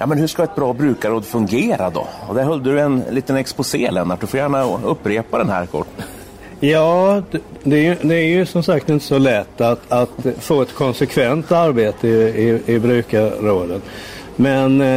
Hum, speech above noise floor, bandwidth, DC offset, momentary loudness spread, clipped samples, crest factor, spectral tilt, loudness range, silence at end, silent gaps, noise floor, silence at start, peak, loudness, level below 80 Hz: none; 20 dB; 16 kHz; under 0.1%; 8 LU; under 0.1%; 12 dB; -6.5 dB/octave; 3 LU; 0 s; none; -36 dBFS; 0 s; -4 dBFS; -17 LUFS; -48 dBFS